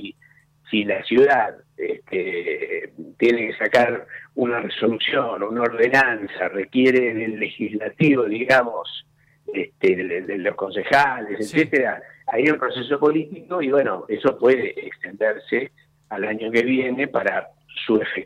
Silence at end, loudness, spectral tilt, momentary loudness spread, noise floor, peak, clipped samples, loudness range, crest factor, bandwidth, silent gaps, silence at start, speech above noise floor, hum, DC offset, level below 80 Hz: 0 s; -21 LUFS; -6 dB/octave; 12 LU; -56 dBFS; -6 dBFS; under 0.1%; 3 LU; 16 dB; 12.5 kHz; none; 0 s; 35 dB; none; under 0.1%; -66 dBFS